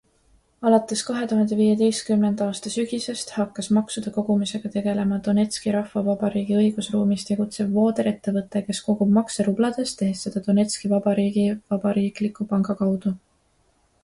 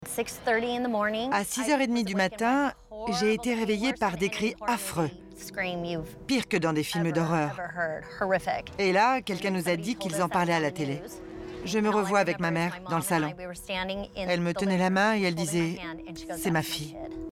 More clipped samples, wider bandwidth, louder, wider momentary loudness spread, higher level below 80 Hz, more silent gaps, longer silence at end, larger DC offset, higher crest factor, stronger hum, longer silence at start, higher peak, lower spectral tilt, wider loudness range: neither; second, 11.5 kHz vs 17 kHz; first, -23 LUFS vs -28 LUFS; about the same, 7 LU vs 9 LU; about the same, -60 dBFS vs -56 dBFS; neither; first, 0.85 s vs 0 s; neither; about the same, 18 dB vs 18 dB; neither; first, 0.6 s vs 0 s; first, -6 dBFS vs -10 dBFS; about the same, -6 dB/octave vs -5 dB/octave; about the same, 2 LU vs 2 LU